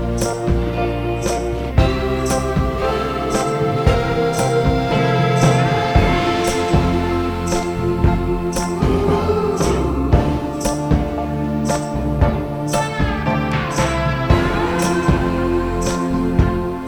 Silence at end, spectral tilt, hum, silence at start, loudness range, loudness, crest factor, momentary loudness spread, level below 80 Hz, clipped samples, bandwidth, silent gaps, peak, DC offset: 0 s; -6 dB/octave; none; 0 s; 3 LU; -18 LUFS; 16 dB; 5 LU; -26 dBFS; under 0.1%; 19 kHz; none; -2 dBFS; under 0.1%